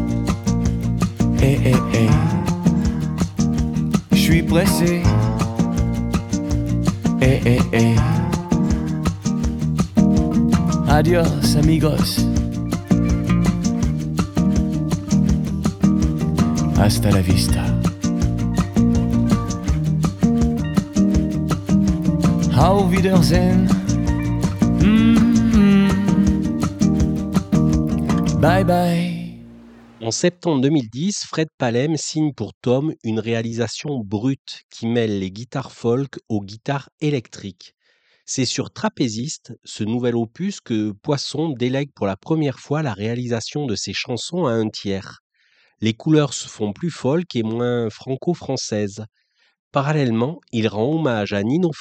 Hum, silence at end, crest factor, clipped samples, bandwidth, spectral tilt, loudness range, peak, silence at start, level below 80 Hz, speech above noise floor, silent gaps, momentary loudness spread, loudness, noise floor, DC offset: none; 0 s; 16 dB; under 0.1%; 16.5 kHz; -6.5 dB/octave; 8 LU; -2 dBFS; 0 s; -30 dBFS; 24 dB; 31.54-31.58 s, 32.54-32.61 s, 34.39-34.45 s, 34.63-34.69 s, 36.92-36.98 s, 45.20-45.30 s, 49.59-49.71 s; 9 LU; -19 LUFS; -43 dBFS; under 0.1%